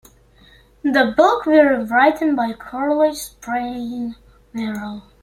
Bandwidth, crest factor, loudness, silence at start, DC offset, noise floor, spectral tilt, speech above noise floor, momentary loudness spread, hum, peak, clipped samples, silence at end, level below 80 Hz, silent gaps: 16.5 kHz; 18 dB; -18 LUFS; 0.85 s; under 0.1%; -50 dBFS; -4.5 dB/octave; 32 dB; 15 LU; none; -2 dBFS; under 0.1%; 0.25 s; -52 dBFS; none